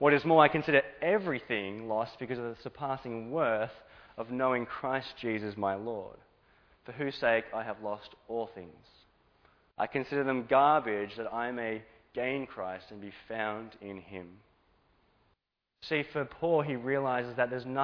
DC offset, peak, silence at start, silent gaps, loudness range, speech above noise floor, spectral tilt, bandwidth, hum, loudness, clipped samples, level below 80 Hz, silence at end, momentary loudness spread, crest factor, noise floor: under 0.1%; -8 dBFS; 0 s; none; 8 LU; 48 dB; -8 dB/octave; 5.4 kHz; none; -32 LUFS; under 0.1%; -68 dBFS; 0 s; 18 LU; 26 dB; -79 dBFS